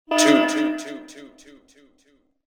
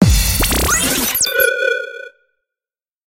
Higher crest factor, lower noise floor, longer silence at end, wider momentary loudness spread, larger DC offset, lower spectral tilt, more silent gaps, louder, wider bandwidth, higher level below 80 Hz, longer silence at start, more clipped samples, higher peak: about the same, 20 dB vs 16 dB; second, -62 dBFS vs under -90 dBFS; first, 1.2 s vs 1 s; first, 22 LU vs 10 LU; neither; about the same, -2 dB/octave vs -3 dB/octave; neither; second, -19 LUFS vs -14 LUFS; first, over 20 kHz vs 17.5 kHz; second, -68 dBFS vs -24 dBFS; about the same, 0.1 s vs 0 s; neither; second, -4 dBFS vs 0 dBFS